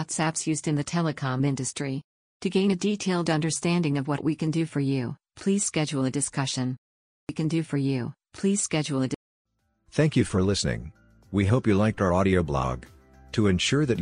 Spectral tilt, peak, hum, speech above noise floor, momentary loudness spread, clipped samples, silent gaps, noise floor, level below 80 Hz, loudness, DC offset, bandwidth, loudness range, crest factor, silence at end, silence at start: -5 dB/octave; -8 dBFS; none; 33 dB; 9 LU; under 0.1%; 2.04-2.40 s, 6.78-7.27 s, 9.16-9.45 s; -58 dBFS; -50 dBFS; -26 LUFS; under 0.1%; 10.5 kHz; 3 LU; 18 dB; 0 s; 0 s